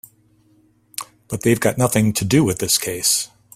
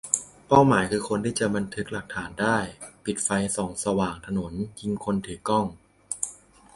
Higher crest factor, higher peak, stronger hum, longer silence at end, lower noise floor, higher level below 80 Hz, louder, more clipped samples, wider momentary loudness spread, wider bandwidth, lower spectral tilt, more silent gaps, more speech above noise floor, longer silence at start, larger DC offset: about the same, 20 dB vs 24 dB; about the same, -2 dBFS vs -2 dBFS; neither; about the same, 0.3 s vs 0.4 s; first, -57 dBFS vs -47 dBFS; about the same, -50 dBFS vs -52 dBFS; first, -18 LUFS vs -26 LUFS; neither; first, 15 LU vs 12 LU; first, 16 kHz vs 11.5 kHz; about the same, -4 dB/octave vs -4.5 dB/octave; neither; first, 39 dB vs 21 dB; first, 1 s vs 0.05 s; neither